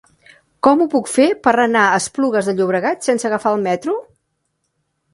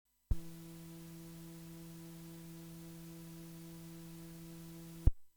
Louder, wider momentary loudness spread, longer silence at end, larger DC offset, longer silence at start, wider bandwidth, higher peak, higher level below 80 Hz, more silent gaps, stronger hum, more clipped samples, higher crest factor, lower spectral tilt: first, -16 LUFS vs -47 LUFS; second, 6 LU vs 11 LU; first, 1.15 s vs 0.05 s; neither; first, 0.65 s vs 0.3 s; second, 11.5 kHz vs over 20 kHz; first, 0 dBFS vs -14 dBFS; second, -62 dBFS vs -44 dBFS; neither; neither; neither; second, 18 dB vs 28 dB; second, -4.5 dB/octave vs -6.5 dB/octave